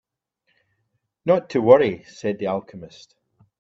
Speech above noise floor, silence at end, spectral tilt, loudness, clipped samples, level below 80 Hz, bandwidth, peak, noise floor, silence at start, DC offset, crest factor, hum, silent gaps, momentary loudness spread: 54 dB; 0.75 s; -7 dB/octave; -20 LUFS; under 0.1%; -64 dBFS; 7.6 kHz; 0 dBFS; -74 dBFS; 1.25 s; under 0.1%; 22 dB; none; none; 17 LU